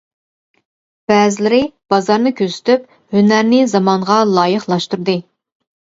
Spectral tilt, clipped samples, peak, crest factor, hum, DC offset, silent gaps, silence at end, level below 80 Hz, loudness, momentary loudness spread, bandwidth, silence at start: -5.5 dB/octave; under 0.1%; 0 dBFS; 14 dB; none; under 0.1%; none; 0.75 s; -58 dBFS; -14 LUFS; 7 LU; 7.8 kHz; 1.1 s